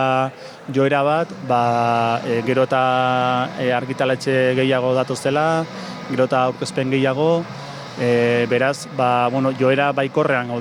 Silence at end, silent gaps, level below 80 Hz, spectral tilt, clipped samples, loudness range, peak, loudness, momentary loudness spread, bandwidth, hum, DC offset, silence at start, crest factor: 0 s; none; -66 dBFS; -6 dB/octave; under 0.1%; 1 LU; -4 dBFS; -19 LUFS; 6 LU; 13 kHz; none; under 0.1%; 0 s; 14 dB